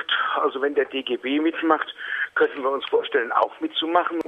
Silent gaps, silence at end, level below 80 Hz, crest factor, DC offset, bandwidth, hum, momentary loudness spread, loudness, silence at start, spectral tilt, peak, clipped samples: none; 0 s; -72 dBFS; 18 dB; under 0.1%; 5.4 kHz; none; 5 LU; -23 LUFS; 0 s; -4.5 dB/octave; -4 dBFS; under 0.1%